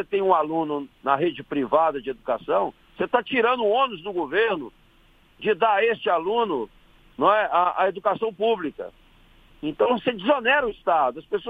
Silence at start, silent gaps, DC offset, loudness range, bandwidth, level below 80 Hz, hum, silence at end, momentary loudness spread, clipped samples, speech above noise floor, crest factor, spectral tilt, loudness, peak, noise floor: 0 s; none; under 0.1%; 2 LU; 4.9 kHz; -58 dBFS; none; 0 s; 11 LU; under 0.1%; 34 dB; 18 dB; -7 dB/octave; -23 LUFS; -4 dBFS; -57 dBFS